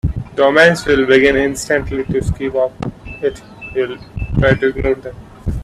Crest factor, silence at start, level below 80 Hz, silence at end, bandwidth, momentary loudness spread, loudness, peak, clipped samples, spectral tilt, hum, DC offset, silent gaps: 16 dB; 0.05 s; -30 dBFS; 0 s; 13.5 kHz; 16 LU; -15 LUFS; 0 dBFS; under 0.1%; -5.5 dB/octave; none; under 0.1%; none